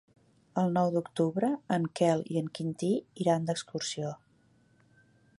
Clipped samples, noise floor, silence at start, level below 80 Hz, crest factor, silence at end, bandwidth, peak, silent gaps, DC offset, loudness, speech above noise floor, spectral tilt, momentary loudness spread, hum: under 0.1%; -66 dBFS; 0.55 s; -74 dBFS; 18 dB; 1.25 s; 11.5 kHz; -12 dBFS; none; under 0.1%; -31 LUFS; 36 dB; -6 dB/octave; 8 LU; none